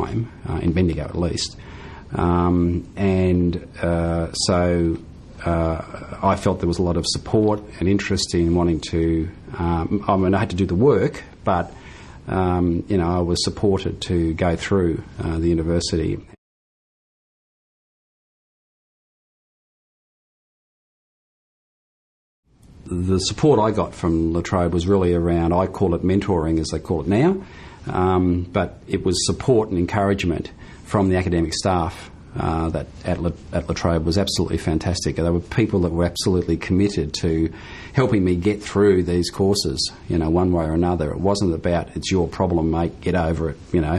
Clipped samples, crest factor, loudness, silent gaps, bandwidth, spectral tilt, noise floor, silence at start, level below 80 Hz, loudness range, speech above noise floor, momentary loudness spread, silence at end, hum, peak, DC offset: under 0.1%; 16 dB; -21 LUFS; 16.38-22.43 s; 12.5 kHz; -6 dB/octave; -40 dBFS; 0 s; -34 dBFS; 3 LU; 20 dB; 8 LU; 0 s; none; -4 dBFS; under 0.1%